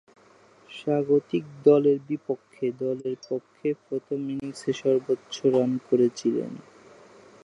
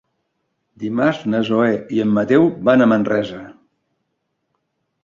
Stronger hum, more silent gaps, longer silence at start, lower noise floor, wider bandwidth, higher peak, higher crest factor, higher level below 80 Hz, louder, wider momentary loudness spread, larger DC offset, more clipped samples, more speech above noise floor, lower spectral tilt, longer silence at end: neither; neither; about the same, 0.7 s vs 0.8 s; second, -56 dBFS vs -73 dBFS; first, 11 kHz vs 7.2 kHz; second, -6 dBFS vs -2 dBFS; about the same, 20 dB vs 16 dB; second, -74 dBFS vs -58 dBFS; second, -26 LUFS vs -17 LUFS; about the same, 12 LU vs 12 LU; neither; neither; second, 31 dB vs 56 dB; about the same, -7 dB/octave vs -7.5 dB/octave; second, 0.85 s vs 1.5 s